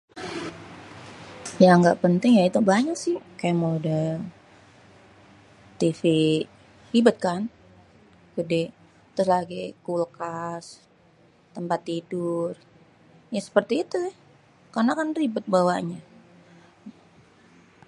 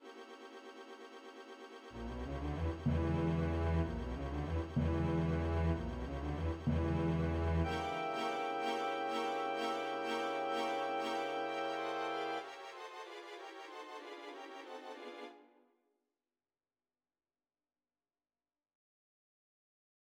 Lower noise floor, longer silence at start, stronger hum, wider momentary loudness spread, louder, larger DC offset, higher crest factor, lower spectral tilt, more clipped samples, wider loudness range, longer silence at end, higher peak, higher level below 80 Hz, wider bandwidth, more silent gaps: second, -58 dBFS vs under -90 dBFS; first, 0.15 s vs 0 s; neither; about the same, 19 LU vs 17 LU; first, -24 LUFS vs -38 LUFS; neither; about the same, 22 dB vs 18 dB; about the same, -6.5 dB/octave vs -7 dB/octave; neither; second, 9 LU vs 14 LU; second, 1 s vs 4.7 s; first, -2 dBFS vs -22 dBFS; second, -66 dBFS vs -48 dBFS; about the same, 11.5 kHz vs 11.5 kHz; neither